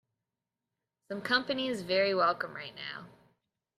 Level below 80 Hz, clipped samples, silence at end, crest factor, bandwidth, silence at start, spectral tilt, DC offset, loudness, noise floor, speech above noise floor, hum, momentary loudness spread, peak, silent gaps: -76 dBFS; under 0.1%; 0.7 s; 22 dB; 14 kHz; 1.1 s; -4.5 dB/octave; under 0.1%; -31 LUFS; -89 dBFS; 57 dB; none; 14 LU; -12 dBFS; none